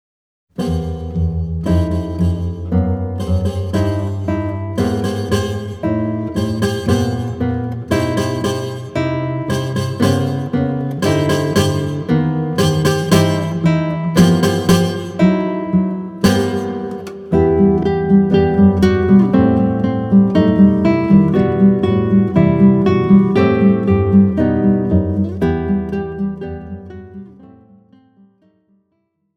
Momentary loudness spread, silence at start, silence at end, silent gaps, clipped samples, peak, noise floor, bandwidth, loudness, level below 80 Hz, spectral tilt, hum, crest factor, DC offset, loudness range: 10 LU; 0.6 s; 1.9 s; none; under 0.1%; 0 dBFS; -67 dBFS; 15.5 kHz; -15 LUFS; -34 dBFS; -7 dB/octave; none; 14 dB; under 0.1%; 7 LU